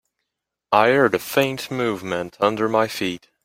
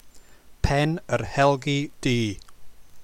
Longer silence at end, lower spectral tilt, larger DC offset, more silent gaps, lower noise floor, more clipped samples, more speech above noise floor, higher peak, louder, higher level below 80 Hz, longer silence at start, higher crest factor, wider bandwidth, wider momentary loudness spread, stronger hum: first, 0.25 s vs 0 s; about the same, -5 dB/octave vs -5.5 dB/octave; neither; neither; first, -82 dBFS vs -47 dBFS; neither; first, 61 dB vs 23 dB; first, -2 dBFS vs -6 dBFS; first, -20 LUFS vs -24 LUFS; second, -60 dBFS vs -38 dBFS; first, 0.7 s vs 0.05 s; about the same, 20 dB vs 18 dB; about the same, 16.5 kHz vs 15 kHz; about the same, 10 LU vs 9 LU; neither